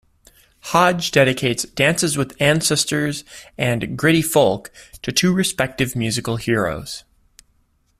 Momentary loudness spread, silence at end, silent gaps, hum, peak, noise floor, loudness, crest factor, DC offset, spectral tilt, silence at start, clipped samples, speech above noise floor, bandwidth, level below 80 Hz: 14 LU; 1 s; none; none; -2 dBFS; -62 dBFS; -18 LUFS; 18 dB; under 0.1%; -4 dB/octave; 0.65 s; under 0.1%; 43 dB; 16 kHz; -48 dBFS